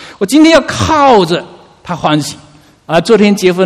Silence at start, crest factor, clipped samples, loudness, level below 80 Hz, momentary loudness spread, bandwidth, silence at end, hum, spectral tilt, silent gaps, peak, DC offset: 0 s; 10 dB; 0.7%; -9 LUFS; -40 dBFS; 10 LU; 15 kHz; 0 s; none; -5 dB/octave; none; 0 dBFS; under 0.1%